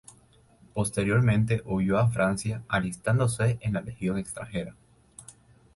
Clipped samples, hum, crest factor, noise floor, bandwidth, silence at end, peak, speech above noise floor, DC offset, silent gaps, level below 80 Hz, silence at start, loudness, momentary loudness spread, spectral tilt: under 0.1%; none; 16 dB; -59 dBFS; 11.5 kHz; 0.45 s; -12 dBFS; 33 dB; under 0.1%; none; -50 dBFS; 0.75 s; -27 LUFS; 13 LU; -6.5 dB/octave